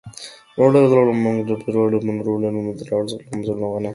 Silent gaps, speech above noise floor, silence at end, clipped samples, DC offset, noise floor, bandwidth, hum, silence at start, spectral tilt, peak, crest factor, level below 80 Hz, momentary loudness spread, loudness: none; 21 dB; 0 s; under 0.1%; under 0.1%; -39 dBFS; 11.5 kHz; none; 0.05 s; -7.5 dB/octave; -2 dBFS; 18 dB; -58 dBFS; 13 LU; -19 LUFS